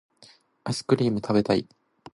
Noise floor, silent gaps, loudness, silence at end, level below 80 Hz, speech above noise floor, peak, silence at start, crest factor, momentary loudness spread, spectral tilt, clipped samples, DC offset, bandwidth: -56 dBFS; none; -25 LUFS; 0.55 s; -60 dBFS; 32 dB; -8 dBFS; 0.65 s; 20 dB; 9 LU; -6.5 dB/octave; under 0.1%; under 0.1%; 11.5 kHz